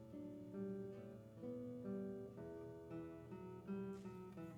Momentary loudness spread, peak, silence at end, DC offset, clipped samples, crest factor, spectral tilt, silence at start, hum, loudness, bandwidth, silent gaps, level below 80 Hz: 6 LU; -38 dBFS; 0 s; under 0.1%; under 0.1%; 14 dB; -9 dB/octave; 0 s; none; -52 LUFS; 17.5 kHz; none; -76 dBFS